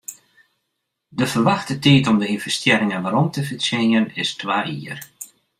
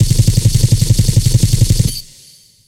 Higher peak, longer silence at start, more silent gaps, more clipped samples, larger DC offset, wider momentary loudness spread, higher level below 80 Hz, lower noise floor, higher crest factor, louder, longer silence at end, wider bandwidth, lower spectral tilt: about the same, -2 dBFS vs 0 dBFS; about the same, 0.1 s vs 0 s; neither; neither; neither; first, 18 LU vs 4 LU; second, -58 dBFS vs -20 dBFS; first, -77 dBFS vs -44 dBFS; first, 18 dB vs 12 dB; second, -19 LUFS vs -13 LUFS; second, 0.35 s vs 0.65 s; about the same, 15.5 kHz vs 16.5 kHz; about the same, -5 dB/octave vs -5 dB/octave